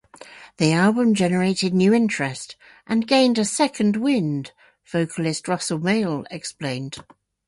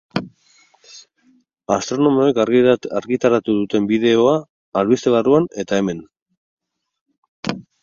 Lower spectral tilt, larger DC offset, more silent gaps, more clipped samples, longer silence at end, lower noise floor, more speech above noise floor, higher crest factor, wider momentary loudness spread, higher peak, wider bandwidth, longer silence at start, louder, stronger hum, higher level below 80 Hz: about the same, -5 dB/octave vs -6 dB/octave; neither; second, none vs 4.50-4.72 s, 6.22-6.26 s, 6.37-6.57 s, 7.01-7.06 s, 7.18-7.22 s, 7.28-7.43 s; neither; first, 0.45 s vs 0.2 s; second, -44 dBFS vs -58 dBFS; second, 23 dB vs 42 dB; about the same, 16 dB vs 18 dB; about the same, 14 LU vs 13 LU; second, -4 dBFS vs 0 dBFS; first, 11.5 kHz vs 7.4 kHz; about the same, 0.2 s vs 0.15 s; second, -21 LUFS vs -18 LUFS; neither; about the same, -62 dBFS vs -58 dBFS